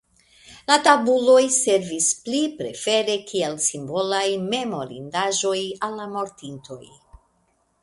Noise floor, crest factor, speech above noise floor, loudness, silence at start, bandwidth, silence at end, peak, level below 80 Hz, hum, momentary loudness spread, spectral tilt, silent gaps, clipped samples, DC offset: -66 dBFS; 22 dB; 45 dB; -21 LUFS; 0.5 s; 11.5 kHz; 0.65 s; 0 dBFS; -62 dBFS; none; 16 LU; -2.5 dB/octave; none; under 0.1%; under 0.1%